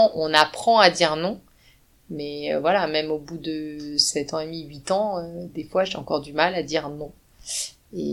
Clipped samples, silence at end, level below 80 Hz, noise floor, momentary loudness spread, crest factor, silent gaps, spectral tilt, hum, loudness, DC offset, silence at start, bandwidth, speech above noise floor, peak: under 0.1%; 0 s; -56 dBFS; -57 dBFS; 17 LU; 24 dB; none; -3 dB/octave; none; -23 LUFS; under 0.1%; 0 s; 17 kHz; 33 dB; 0 dBFS